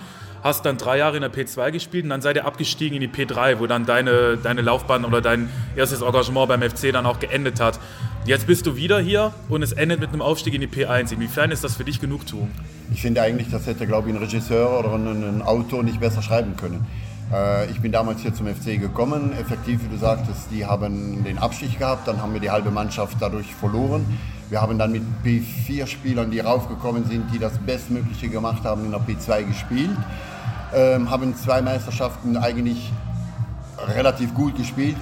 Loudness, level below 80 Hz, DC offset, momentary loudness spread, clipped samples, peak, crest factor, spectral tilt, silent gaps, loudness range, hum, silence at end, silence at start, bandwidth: -22 LUFS; -38 dBFS; under 0.1%; 8 LU; under 0.1%; -4 dBFS; 18 dB; -6 dB/octave; none; 4 LU; none; 0 s; 0 s; 17 kHz